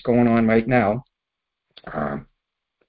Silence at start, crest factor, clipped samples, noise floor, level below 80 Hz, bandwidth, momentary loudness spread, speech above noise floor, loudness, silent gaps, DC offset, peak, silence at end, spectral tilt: 0.05 s; 18 dB; under 0.1%; -83 dBFS; -48 dBFS; 4.8 kHz; 14 LU; 64 dB; -20 LUFS; none; under 0.1%; -4 dBFS; 0.65 s; -12 dB/octave